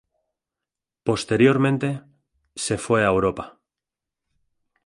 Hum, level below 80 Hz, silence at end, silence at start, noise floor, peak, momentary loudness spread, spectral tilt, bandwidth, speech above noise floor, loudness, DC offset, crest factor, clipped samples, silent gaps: none; -52 dBFS; 1.35 s; 1.05 s; -87 dBFS; -4 dBFS; 18 LU; -5.5 dB/octave; 11.5 kHz; 67 dB; -21 LUFS; under 0.1%; 20 dB; under 0.1%; none